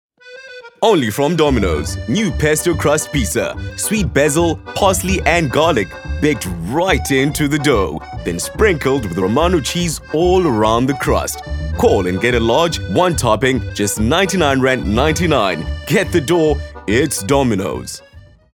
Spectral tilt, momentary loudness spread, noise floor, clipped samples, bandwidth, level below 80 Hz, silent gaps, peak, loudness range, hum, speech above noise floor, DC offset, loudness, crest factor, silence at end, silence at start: -4.5 dB/octave; 8 LU; -37 dBFS; under 0.1%; 20 kHz; -30 dBFS; none; 0 dBFS; 2 LU; none; 22 dB; under 0.1%; -16 LUFS; 16 dB; 0.35 s; 0.25 s